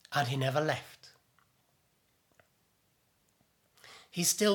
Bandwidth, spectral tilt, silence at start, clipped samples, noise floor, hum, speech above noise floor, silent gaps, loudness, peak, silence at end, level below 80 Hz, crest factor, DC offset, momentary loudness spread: 19.5 kHz; -3.5 dB/octave; 0.1 s; under 0.1%; -73 dBFS; none; 43 dB; none; -32 LUFS; -14 dBFS; 0 s; -80 dBFS; 22 dB; under 0.1%; 24 LU